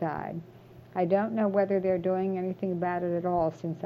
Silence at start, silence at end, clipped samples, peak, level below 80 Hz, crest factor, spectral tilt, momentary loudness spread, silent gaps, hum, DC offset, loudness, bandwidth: 0 s; 0 s; under 0.1%; -12 dBFS; -64 dBFS; 16 dB; -9.5 dB/octave; 9 LU; none; none; under 0.1%; -29 LUFS; 7 kHz